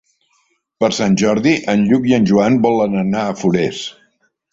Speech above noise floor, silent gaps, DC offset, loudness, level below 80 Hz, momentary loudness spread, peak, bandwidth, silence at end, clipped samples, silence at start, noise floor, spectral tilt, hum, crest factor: 48 dB; none; under 0.1%; -15 LUFS; -52 dBFS; 6 LU; -2 dBFS; 7.8 kHz; 0.6 s; under 0.1%; 0.8 s; -62 dBFS; -6 dB/octave; none; 14 dB